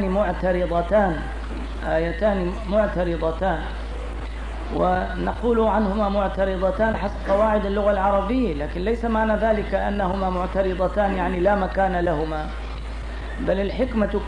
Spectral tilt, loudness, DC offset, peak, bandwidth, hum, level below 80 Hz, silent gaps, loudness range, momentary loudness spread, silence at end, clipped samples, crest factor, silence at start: -7.5 dB/octave; -23 LUFS; 0.3%; -8 dBFS; 10 kHz; none; -30 dBFS; none; 3 LU; 11 LU; 0 s; under 0.1%; 14 dB; 0 s